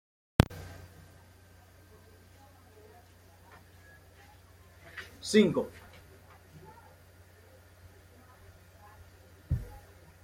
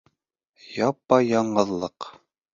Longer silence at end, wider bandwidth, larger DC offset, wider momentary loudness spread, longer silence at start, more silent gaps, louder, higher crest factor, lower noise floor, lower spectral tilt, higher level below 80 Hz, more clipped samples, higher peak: about the same, 0.45 s vs 0.45 s; first, 16.5 kHz vs 7.6 kHz; neither; first, 28 LU vs 18 LU; second, 0.4 s vs 0.7 s; neither; second, -30 LUFS vs -23 LUFS; first, 34 dB vs 22 dB; second, -57 dBFS vs -76 dBFS; about the same, -6 dB/octave vs -6 dB/octave; first, -50 dBFS vs -62 dBFS; neither; about the same, -2 dBFS vs -2 dBFS